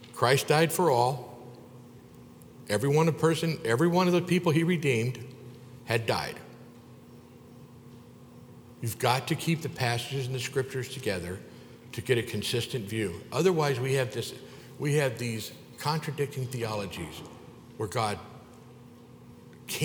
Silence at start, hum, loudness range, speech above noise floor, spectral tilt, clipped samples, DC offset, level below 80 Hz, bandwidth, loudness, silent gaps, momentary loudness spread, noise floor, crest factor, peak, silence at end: 0 s; none; 9 LU; 23 dB; -5 dB/octave; under 0.1%; under 0.1%; -64 dBFS; over 20 kHz; -29 LUFS; none; 23 LU; -50 dBFS; 24 dB; -6 dBFS; 0 s